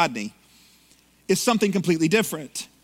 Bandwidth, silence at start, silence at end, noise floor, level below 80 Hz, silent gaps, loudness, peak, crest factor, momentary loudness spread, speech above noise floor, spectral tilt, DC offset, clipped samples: 16.5 kHz; 0 s; 0.2 s; -58 dBFS; -66 dBFS; none; -23 LUFS; -4 dBFS; 20 dB; 14 LU; 35 dB; -4.5 dB/octave; under 0.1%; under 0.1%